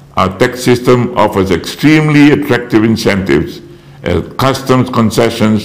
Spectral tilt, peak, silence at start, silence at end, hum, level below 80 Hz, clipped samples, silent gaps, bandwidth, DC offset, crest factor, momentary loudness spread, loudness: -6 dB/octave; 0 dBFS; 0.15 s; 0 s; none; -40 dBFS; under 0.1%; none; 16 kHz; 0.7%; 10 dB; 8 LU; -10 LUFS